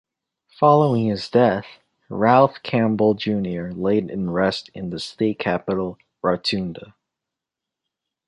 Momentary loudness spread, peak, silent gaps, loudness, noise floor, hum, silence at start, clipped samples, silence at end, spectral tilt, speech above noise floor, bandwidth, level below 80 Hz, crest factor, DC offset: 13 LU; -2 dBFS; none; -21 LUFS; -86 dBFS; none; 0.6 s; under 0.1%; 1.45 s; -7 dB/octave; 66 dB; 10.5 kHz; -54 dBFS; 20 dB; under 0.1%